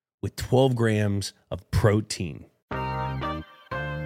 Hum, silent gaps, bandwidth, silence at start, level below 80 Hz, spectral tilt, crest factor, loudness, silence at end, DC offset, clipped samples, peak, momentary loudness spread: none; 2.62-2.68 s; 16 kHz; 0.25 s; -44 dBFS; -6 dB/octave; 20 dB; -26 LUFS; 0 s; under 0.1%; under 0.1%; -6 dBFS; 14 LU